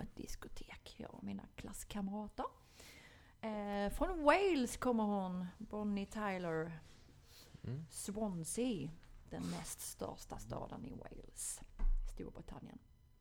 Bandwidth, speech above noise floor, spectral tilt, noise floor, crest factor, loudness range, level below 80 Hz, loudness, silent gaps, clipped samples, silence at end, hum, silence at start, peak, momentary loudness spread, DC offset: 19 kHz; 21 dB; -5 dB/octave; -62 dBFS; 26 dB; 10 LU; -50 dBFS; -42 LUFS; none; under 0.1%; 0.35 s; none; 0 s; -16 dBFS; 19 LU; under 0.1%